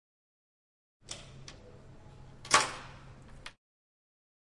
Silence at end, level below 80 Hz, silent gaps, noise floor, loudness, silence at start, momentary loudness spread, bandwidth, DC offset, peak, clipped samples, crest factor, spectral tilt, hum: 1.05 s; -60 dBFS; none; -53 dBFS; -29 LUFS; 1.05 s; 28 LU; 11.5 kHz; under 0.1%; -6 dBFS; under 0.1%; 32 dB; -1 dB/octave; none